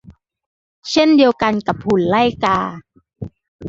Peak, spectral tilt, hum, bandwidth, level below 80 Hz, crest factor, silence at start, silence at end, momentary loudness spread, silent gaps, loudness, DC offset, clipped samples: -2 dBFS; -5.5 dB/octave; none; 7.8 kHz; -48 dBFS; 16 dB; 0.1 s; 0 s; 22 LU; 0.46-0.82 s, 3.48-3.59 s; -16 LUFS; under 0.1%; under 0.1%